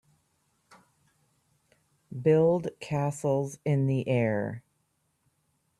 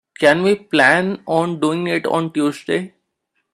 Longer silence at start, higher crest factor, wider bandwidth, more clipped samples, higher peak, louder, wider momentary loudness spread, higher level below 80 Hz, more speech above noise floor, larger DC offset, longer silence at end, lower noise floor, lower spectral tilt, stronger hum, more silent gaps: first, 2.1 s vs 0.2 s; about the same, 18 dB vs 18 dB; about the same, 12.5 kHz vs 13.5 kHz; neither; second, -12 dBFS vs 0 dBFS; second, -28 LUFS vs -17 LUFS; about the same, 11 LU vs 9 LU; second, -68 dBFS vs -62 dBFS; second, 48 dB vs 55 dB; neither; first, 1.2 s vs 0.65 s; about the same, -75 dBFS vs -72 dBFS; first, -7.5 dB/octave vs -5.5 dB/octave; neither; neither